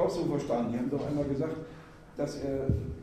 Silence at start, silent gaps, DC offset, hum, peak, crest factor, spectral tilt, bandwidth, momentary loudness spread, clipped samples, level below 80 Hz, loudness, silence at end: 0 s; none; under 0.1%; none; -14 dBFS; 18 dB; -7.5 dB/octave; 14 kHz; 13 LU; under 0.1%; -46 dBFS; -32 LUFS; 0 s